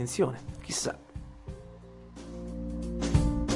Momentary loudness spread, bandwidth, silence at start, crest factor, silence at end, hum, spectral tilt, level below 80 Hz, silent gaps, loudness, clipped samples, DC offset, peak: 19 LU; 11.5 kHz; 0 s; 22 dB; 0 s; none; -5 dB/octave; -38 dBFS; none; -32 LUFS; under 0.1%; under 0.1%; -10 dBFS